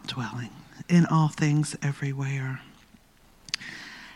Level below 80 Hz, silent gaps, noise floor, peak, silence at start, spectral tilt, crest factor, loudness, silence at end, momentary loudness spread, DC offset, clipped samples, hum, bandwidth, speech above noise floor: -62 dBFS; none; -57 dBFS; -6 dBFS; 0.05 s; -6 dB/octave; 22 dB; -27 LUFS; 0 s; 18 LU; under 0.1%; under 0.1%; none; 12 kHz; 32 dB